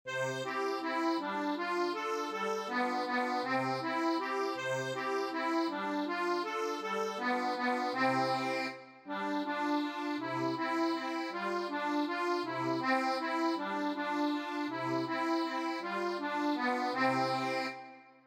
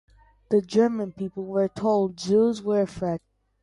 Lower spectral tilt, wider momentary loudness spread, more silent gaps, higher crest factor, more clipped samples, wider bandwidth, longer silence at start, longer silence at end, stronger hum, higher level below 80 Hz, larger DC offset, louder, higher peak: second, -4.5 dB/octave vs -7 dB/octave; second, 5 LU vs 9 LU; neither; about the same, 16 dB vs 16 dB; neither; first, 16 kHz vs 11 kHz; second, 0.05 s vs 0.5 s; second, 0.15 s vs 0.45 s; neither; second, -90 dBFS vs -60 dBFS; neither; second, -34 LUFS vs -25 LUFS; second, -18 dBFS vs -8 dBFS